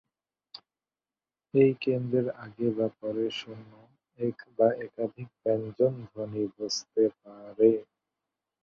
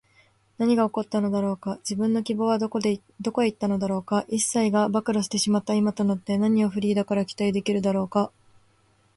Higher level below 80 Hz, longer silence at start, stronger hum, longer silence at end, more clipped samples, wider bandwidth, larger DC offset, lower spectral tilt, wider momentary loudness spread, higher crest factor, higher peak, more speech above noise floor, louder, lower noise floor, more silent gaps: second, -72 dBFS vs -64 dBFS; first, 1.55 s vs 0.6 s; neither; about the same, 0.8 s vs 0.9 s; neither; second, 7.4 kHz vs 11.5 kHz; neither; about the same, -6 dB/octave vs -5.5 dB/octave; first, 21 LU vs 5 LU; first, 20 dB vs 14 dB; about the same, -10 dBFS vs -10 dBFS; first, over 62 dB vs 39 dB; second, -29 LUFS vs -25 LUFS; first, under -90 dBFS vs -63 dBFS; neither